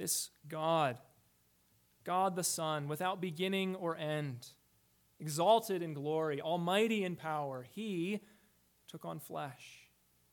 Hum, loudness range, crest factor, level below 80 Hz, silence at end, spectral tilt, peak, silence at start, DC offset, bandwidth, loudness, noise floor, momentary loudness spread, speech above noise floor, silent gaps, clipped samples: none; 3 LU; 20 dB; -82 dBFS; 0.5 s; -4 dB/octave; -16 dBFS; 0 s; under 0.1%; 19 kHz; -36 LUFS; -72 dBFS; 16 LU; 36 dB; none; under 0.1%